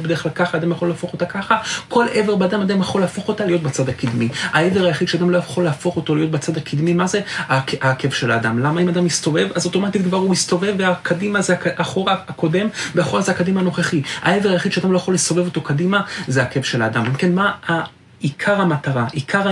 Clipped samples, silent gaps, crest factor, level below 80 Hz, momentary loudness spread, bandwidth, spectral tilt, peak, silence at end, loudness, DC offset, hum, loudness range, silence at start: under 0.1%; none; 16 dB; -58 dBFS; 4 LU; 11.5 kHz; -5 dB/octave; -2 dBFS; 0 s; -18 LUFS; under 0.1%; none; 1 LU; 0 s